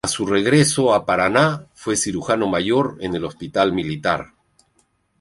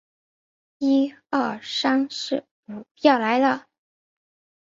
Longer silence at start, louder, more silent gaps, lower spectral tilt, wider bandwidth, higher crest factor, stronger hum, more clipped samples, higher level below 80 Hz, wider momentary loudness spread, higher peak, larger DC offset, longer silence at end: second, 0.05 s vs 0.8 s; first, -19 LUFS vs -23 LUFS; second, none vs 2.51-2.63 s, 2.91-2.95 s; about the same, -4.5 dB/octave vs -4 dB/octave; first, 11.5 kHz vs 7.6 kHz; about the same, 18 dB vs 22 dB; neither; neither; first, -50 dBFS vs -70 dBFS; about the same, 10 LU vs 11 LU; about the same, -2 dBFS vs -2 dBFS; neither; second, 0.95 s vs 1.1 s